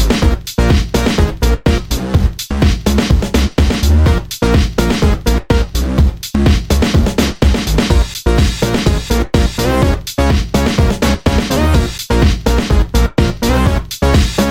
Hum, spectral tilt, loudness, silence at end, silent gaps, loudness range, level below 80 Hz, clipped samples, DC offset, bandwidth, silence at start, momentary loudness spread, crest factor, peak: none; -5.5 dB/octave; -14 LUFS; 0 s; none; 1 LU; -16 dBFS; under 0.1%; under 0.1%; 16.5 kHz; 0 s; 3 LU; 12 dB; 0 dBFS